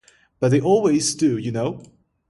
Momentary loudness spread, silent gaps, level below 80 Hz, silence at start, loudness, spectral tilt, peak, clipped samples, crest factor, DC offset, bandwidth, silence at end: 10 LU; none; -58 dBFS; 0.4 s; -20 LUFS; -5.5 dB/octave; -6 dBFS; under 0.1%; 14 dB; under 0.1%; 11.5 kHz; 0.45 s